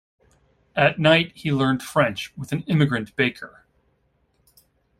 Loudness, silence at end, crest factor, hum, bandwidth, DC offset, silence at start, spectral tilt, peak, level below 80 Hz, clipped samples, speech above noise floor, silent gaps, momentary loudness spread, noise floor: -21 LUFS; 1.5 s; 22 dB; none; 15.5 kHz; under 0.1%; 0.75 s; -6 dB/octave; -2 dBFS; -58 dBFS; under 0.1%; 45 dB; none; 13 LU; -67 dBFS